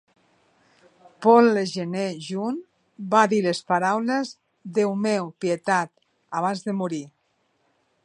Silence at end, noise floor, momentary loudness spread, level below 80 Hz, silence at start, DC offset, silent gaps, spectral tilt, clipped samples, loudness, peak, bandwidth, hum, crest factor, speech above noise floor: 0.95 s; -69 dBFS; 15 LU; -74 dBFS; 1.2 s; under 0.1%; none; -5.5 dB/octave; under 0.1%; -23 LUFS; -2 dBFS; 10.5 kHz; none; 22 dB; 47 dB